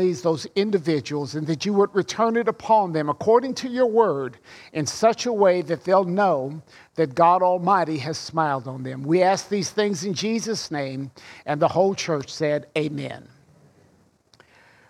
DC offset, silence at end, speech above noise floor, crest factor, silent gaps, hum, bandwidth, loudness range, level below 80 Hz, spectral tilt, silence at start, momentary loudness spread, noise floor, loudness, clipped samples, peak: under 0.1%; 1.7 s; 37 dB; 18 dB; none; none; 13.5 kHz; 5 LU; -66 dBFS; -5 dB/octave; 0 s; 12 LU; -59 dBFS; -22 LUFS; under 0.1%; -4 dBFS